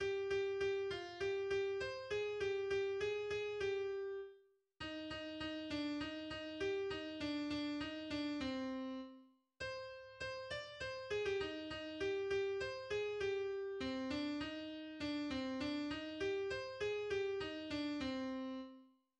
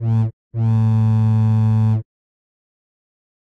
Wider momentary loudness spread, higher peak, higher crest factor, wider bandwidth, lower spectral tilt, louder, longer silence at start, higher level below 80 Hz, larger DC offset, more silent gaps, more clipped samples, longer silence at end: about the same, 8 LU vs 7 LU; second, -30 dBFS vs -10 dBFS; about the same, 12 dB vs 8 dB; first, 9.4 kHz vs 3.6 kHz; second, -5 dB/octave vs -10.5 dB/octave; second, -42 LUFS vs -18 LUFS; about the same, 0 s vs 0 s; second, -66 dBFS vs -48 dBFS; neither; second, none vs 0.33-0.51 s; neither; second, 0.35 s vs 1.4 s